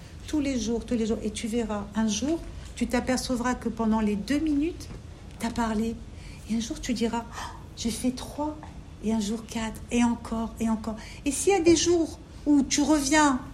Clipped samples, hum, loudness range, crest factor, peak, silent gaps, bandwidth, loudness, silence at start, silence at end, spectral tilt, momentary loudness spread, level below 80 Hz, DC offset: under 0.1%; none; 6 LU; 18 dB; -8 dBFS; none; 14.5 kHz; -27 LUFS; 0 s; 0 s; -4 dB/octave; 14 LU; -44 dBFS; under 0.1%